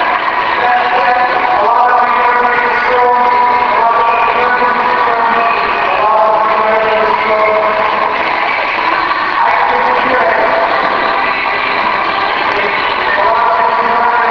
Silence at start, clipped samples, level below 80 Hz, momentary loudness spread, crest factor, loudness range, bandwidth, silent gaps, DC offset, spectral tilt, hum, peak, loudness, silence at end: 0 s; under 0.1%; -44 dBFS; 3 LU; 10 dB; 2 LU; 5.4 kHz; none; under 0.1%; -4.5 dB/octave; none; 0 dBFS; -11 LUFS; 0 s